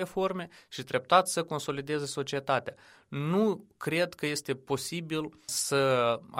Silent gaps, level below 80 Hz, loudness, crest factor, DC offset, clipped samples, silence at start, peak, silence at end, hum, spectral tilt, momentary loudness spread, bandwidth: none; -70 dBFS; -30 LUFS; 22 dB; under 0.1%; under 0.1%; 0 s; -8 dBFS; 0 s; none; -4 dB/octave; 11 LU; 16 kHz